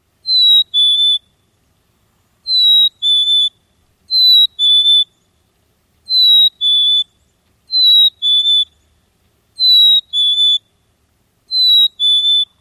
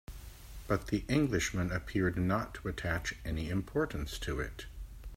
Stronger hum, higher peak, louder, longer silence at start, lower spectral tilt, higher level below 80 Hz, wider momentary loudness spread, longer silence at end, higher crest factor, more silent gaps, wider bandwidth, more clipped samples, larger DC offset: neither; first, -4 dBFS vs -16 dBFS; first, -9 LUFS vs -34 LUFS; first, 0.25 s vs 0.1 s; second, 2.5 dB/octave vs -5.5 dB/octave; second, -64 dBFS vs -46 dBFS; second, 9 LU vs 18 LU; first, 0.15 s vs 0 s; second, 10 dB vs 20 dB; neither; second, 13 kHz vs 16 kHz; neither; neither